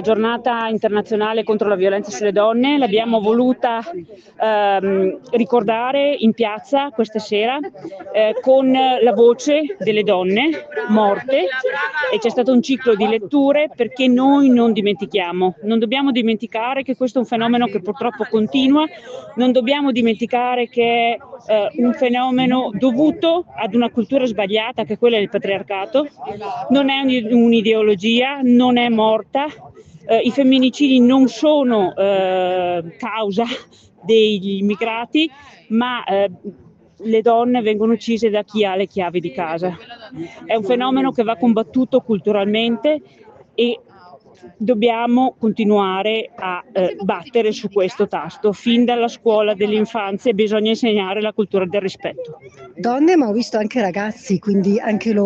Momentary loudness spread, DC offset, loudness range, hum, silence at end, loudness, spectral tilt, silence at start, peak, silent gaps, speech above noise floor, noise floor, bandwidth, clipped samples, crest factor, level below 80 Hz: 8 LU; under 0.1%; 4 LU; none; 0 s; -17 LUFS; -6 dB/octave; 0 s; -2 dBFS; none; 27 dB; -44 dBFS; 7.6 kHz; under 0.1%; 14 dB; -62 dBFS